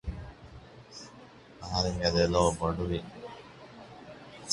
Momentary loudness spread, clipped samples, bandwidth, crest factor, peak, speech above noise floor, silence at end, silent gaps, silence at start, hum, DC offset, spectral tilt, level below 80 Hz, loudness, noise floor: 25 LU; under 0.1%; 11.5 kHz; 24 dB; -10 dBFS; 24 dB; 0 s; none; 0.05 s; none; under 0.1%; -5 dB/octave; -46 dBFS; -29 LUFS; -52 dBFS